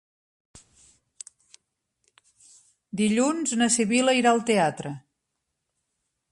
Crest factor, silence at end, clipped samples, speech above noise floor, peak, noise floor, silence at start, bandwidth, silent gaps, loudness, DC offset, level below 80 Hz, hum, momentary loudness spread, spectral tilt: 18 dB; 1.35 s; under 0.1%; 58 dB; -8 dBFS; -81 dBFS; 2.95 s; 11.5 kHz; none; -22 LUFS; under 0.1%; -70 dBFS; none; 23 LU; -3.5 dB/octave